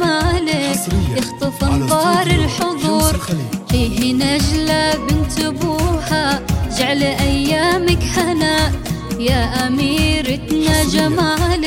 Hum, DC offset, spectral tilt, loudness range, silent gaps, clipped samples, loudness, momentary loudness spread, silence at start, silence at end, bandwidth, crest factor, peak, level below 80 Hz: none; under 0.1%; -4.5 dB/octave; 1 LU; none; under 0.1%; -16 LUFS; 5 LU; 0 s; 0 s; 17 kHz; 14 dB; 0 dBFS; -26 dBFS